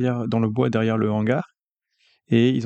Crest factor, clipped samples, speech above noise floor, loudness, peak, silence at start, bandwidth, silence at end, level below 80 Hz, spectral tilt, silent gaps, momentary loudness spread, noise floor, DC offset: 16 dB; under 0.1%; 51 dB; -22 LUFS; -6 dBFS; 0 s; 7.8 kHz; 0 s; -64 dBFS; -8 dB/octave; 1.62-1.76 s; 5 LU; -71 dBFS; under 0.1%